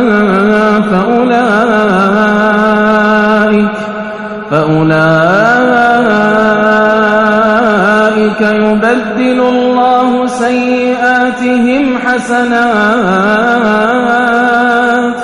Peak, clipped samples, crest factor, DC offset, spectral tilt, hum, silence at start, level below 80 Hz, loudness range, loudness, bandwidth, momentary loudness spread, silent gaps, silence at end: 0 dBFS; 2%; 8 dB; under 0.1%; -6 dB/octave; none; 0 s; -44 dBFS; 2 LU; -9 LUFS; 11 kHz; 4 LU; none; 0 s